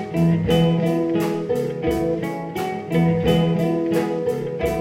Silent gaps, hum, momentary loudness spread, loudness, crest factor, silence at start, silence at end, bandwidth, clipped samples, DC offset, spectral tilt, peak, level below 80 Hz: none; none; 7 LU; -21 LUFS; 14 dB; 0 s; 0 s; 16 kHz; under 0.1%; under 0.1%; -7.5 dB/octave; -6 dBFS; -42 dBFS